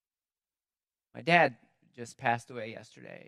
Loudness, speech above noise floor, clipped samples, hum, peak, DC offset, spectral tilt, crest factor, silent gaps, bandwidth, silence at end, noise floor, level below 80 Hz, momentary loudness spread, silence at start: -28 LUFS; over 59 dB; under 0.1%; none; -6 dBFS; under 0.1%; -5 dB/octave; 26 dB; none; 12 kHz; 0.1 s; under -90 dBFS; -82 dBFS; 23 LU; 1.15 s